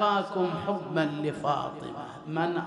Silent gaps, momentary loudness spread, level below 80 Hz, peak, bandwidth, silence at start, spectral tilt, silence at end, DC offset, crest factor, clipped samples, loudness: none; 11 LU; -68 dBFS; -12 dBFS; 11 kHz; 0 s; -6.5 dB/octave; 0 s; under 0.1%; 16 dB; under 0.1%; -30 LUFS